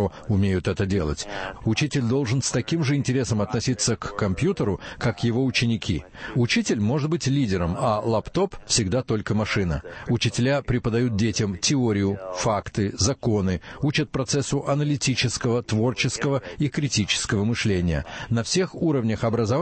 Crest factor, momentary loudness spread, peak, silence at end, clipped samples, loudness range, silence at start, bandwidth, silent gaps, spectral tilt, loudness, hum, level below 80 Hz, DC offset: 16 dB; 5 LU; -8 dBFS; 0 s; under 0.1%; 1 LU; 0 s; 8.8 kHz; none; -5 dB/octave; -24 LUFS; none; -44 dBFS; under 0.1%